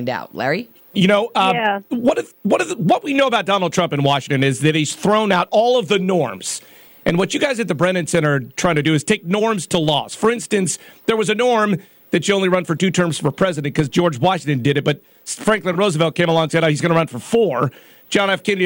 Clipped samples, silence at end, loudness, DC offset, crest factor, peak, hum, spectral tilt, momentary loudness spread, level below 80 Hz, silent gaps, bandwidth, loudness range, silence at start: under 0.1%; 0 s; -18 LUFS; under 0.1%; 14 dB; -4 dBFS; none; -5 dB/octave; 7 LU; -54 dBFS; none; 17 kHz; 2 LU; 0 s